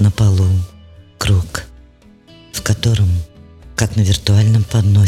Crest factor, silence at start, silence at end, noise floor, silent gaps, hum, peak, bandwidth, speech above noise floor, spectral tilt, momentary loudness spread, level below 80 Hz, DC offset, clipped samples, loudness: 14 dB; 0 s; 0 s; -45 dBFS; none; none; 0 dBFS; 14 kHz; 33 dB; -5.5 dB/octave; 14 LU; -32 dBFS; under 0.1%; under 0.1%; -16 LUFS